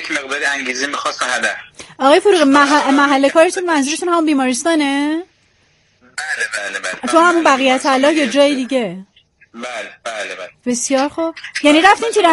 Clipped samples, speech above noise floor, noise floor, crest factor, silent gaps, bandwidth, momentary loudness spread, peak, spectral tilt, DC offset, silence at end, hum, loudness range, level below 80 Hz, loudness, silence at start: under 0.1%; 42 dB; -56 dBFS; 16 dB; none; 11.5 kHz; 15 LU; 0 dBFS; -2 dB/octave; under 0.1%; 0 s; none; 6 LU; -60 dBFS; -14 LUFS; 0 s